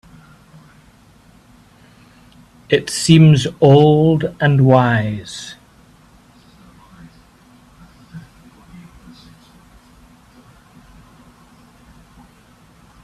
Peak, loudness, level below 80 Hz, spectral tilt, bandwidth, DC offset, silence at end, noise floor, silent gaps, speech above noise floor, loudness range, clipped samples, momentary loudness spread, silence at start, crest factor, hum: 0 dBFS; -13 LUFS; -50 dBFS; -6.5 dB/octave; 12 kHz; under 0.1%; 4.85 s; -48 dBFS; none; 36 dB; 12 LU; under 0.1%; 28 LU; 2.7 s; 18 dB; none